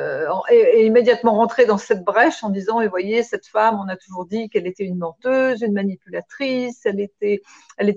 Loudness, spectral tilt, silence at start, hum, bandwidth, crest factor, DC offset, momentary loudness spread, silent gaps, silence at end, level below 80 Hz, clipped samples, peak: -19 LUFS; -6 dB/octave; 0 s; none; 7.6 kHz; 16 dB; under 0.1%; 12 LU; none; 0 s; -66 dBFS; under 0.1%; -2 dBFS